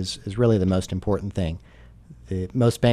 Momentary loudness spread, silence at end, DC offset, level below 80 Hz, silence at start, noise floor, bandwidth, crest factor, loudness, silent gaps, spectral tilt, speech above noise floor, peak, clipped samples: 11 LU; 0 s; under 0.1%; -42 dBFS; 0 s; -46 dBFS; 13 kHz; 18 dB; -24 LUFS; none; -7 dB/octave; 24 dB; -6 dBFS; under 0.1%